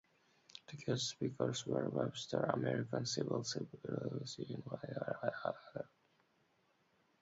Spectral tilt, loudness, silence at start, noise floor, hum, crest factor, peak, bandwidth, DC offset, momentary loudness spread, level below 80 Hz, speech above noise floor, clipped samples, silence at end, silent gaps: -5 dB/octave; -41 LUFS; 0.55 s; -77 dBFS; none; 22 dB; -20 dBFS; 7.6 kHz; under 0.1%; 10 LU; -76 dBFS; 36 dB; under 0.1%; 1.35 s; none